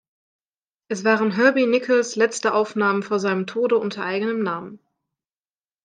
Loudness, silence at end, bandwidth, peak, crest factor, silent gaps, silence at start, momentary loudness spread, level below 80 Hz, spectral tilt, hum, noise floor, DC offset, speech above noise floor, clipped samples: -21 LUFS; 1.1 s; 9.8 kHz; -4 dBFS; 18 dB; none; 0.9 s; 8 LU; -76 dBFS; -4.5 dB/octave; none; under -90 dBFS; under 0.1%; over 69 dB; under 0.1%